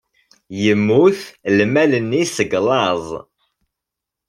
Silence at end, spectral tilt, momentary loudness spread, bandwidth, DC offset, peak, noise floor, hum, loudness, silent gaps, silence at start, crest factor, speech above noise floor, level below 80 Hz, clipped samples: 1.1 s; -5.5 dB/octave; 12 LU; 14.5 kHz; under 0.1%; -2 dBFS; -83 dBFS; none; -16 LUFS; none; 0.5 s; 16 dB; 67 dB; -58 dBFS; under 0.1%